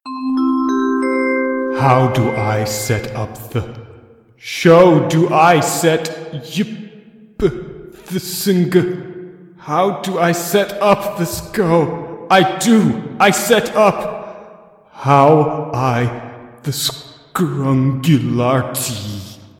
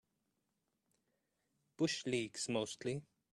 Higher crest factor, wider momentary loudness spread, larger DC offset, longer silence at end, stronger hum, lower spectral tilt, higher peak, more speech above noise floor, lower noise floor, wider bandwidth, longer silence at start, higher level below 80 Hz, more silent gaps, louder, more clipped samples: about the same, 16 dB vs 20 dB; first, 16 LU vs 6 LU; neither; about the same, 0.25 s vs 0.3 s; neither; first, -5.5 dB/octave vs -4 dB/octave; first, 0 dBFS vs -24 dBFS; second, 30 dB vs 46 dB; second, -44 dBFS vs -85 dBFS; first, 17 kHz vs 12.5 kHz; second, 0.05 s vs 1.8 s; first, -46 dBFS vs -80 dBFS; neither; first, -15 LUFS vs -40 LUFS; neither